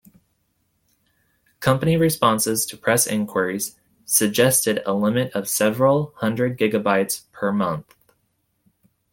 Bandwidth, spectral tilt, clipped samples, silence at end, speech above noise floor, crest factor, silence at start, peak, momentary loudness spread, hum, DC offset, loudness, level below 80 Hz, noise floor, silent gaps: 17 kHz; -4 dB/octave; under 0.1%; 1.3 s; 50 dB; 20 dB; 1.6 s; -2 dBFS; 8 LU; none; under 0.1%; -20 LUFS; -56 dBFS; -70 dBFS; none